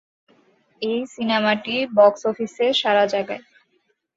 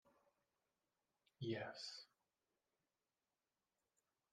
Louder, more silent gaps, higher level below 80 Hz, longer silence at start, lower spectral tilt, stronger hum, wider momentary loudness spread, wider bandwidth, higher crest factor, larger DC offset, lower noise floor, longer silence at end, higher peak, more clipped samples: first, -20 LUFS vs -50 LUFS; neither; first, -68 dBFS vs under -90 dBFS; first, 0.8 s vs 0.05 s; about the same, -4.5 dB/octave vs -5 dB/octave; neither; about the same, 11 LU vs 12 LU; second, 7.8 kHz vs 11 kHz; about the same, 20 dB vs 24 dB; neither; second, -68 dBFS vs under -90 dBFS; second, 0.75 s vs 2.25 s; first, -2 dBFS vs -32 dBFS; neither